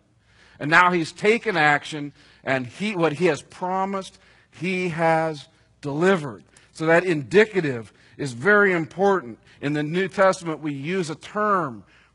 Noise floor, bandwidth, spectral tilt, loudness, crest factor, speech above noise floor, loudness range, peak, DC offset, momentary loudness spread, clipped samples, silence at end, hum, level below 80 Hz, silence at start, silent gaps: -57 dBFS; 11 kHz; -5.5 dB/octave; -22 LUFS; 22 dB; 34 dB; 4 LU; 0 dBFS; under 0.1%; 15 LU; under 0.1%; 0.35 s; none; -64 dBFS; 0.6 s; none